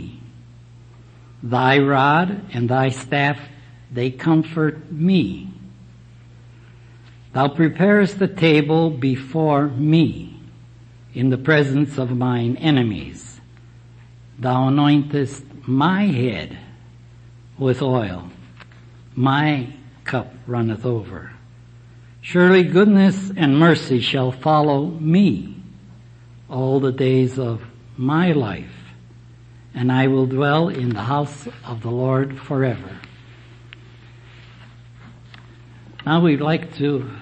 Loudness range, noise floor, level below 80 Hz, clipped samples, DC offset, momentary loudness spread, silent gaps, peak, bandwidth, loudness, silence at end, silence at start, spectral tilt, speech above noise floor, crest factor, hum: 7 LU; -44 dBFS; -52 dBFS; under 0.1%; under 0.1%; 19 LU; none; -2 dBFS; 8.8 kHz; -19 LUFS; 0 s; 0 s; -7.5 dB/octave; 26 dB; 18 dB; none